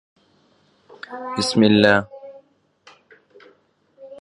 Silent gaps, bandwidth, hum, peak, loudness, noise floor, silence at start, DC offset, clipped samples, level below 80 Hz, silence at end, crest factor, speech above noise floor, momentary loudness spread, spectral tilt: none; 11.5 kHz; none; 0 dBFS; -17 LUFS; -60 dBFS; 1.1 s; under 0.1%; under 0.1%; -58 dBFS; 0 s; 22 dB; 43 dB; 26 LU; -5 dB/octave